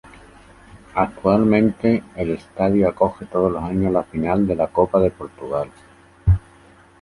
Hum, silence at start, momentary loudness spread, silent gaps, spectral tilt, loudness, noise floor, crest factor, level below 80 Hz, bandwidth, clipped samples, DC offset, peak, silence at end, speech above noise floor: none; 0.75 s; 9 LU; none; -9.5 dB/octave; -20 LUFS; -49 dBFS; 18 dB; -34 dBFS; 11.5 kHz; under 0.1%; under 0.1%; -2 dBFS; 0.65 s; 30 dB